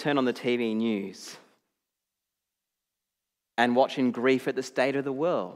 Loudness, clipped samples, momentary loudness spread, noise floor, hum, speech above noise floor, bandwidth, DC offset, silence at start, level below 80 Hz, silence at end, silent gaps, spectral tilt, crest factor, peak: -27 LUFS; under 0.1%; 11 LU; -86 dBFS; none; 60 dB; 13.5 kHz; under 0.1%; 0 s; -88 dBFS; 0 s; none; -5.5 dB/octave; 20 dB; -8 dBFS